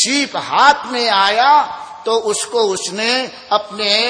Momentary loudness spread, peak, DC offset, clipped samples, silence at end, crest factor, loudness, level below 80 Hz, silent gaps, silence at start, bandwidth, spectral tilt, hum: 7 LU; 0 dBFS; under 0.1%; under 0.1%; 0 s; 16 dB; -15 LUFS; -60 dBFS; none; 0 s; 10 kHz; -1 dB/octave; none